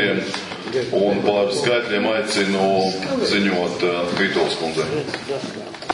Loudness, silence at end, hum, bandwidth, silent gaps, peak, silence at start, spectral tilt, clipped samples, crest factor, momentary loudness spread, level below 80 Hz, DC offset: -20 LUFS; 0 s; none; 11 kHz; none; -2 dBFS; 0 s; -4.5 dB/octave; under 0.1%; 18 dB; 8 LU; -58 dBFS; under 0.1%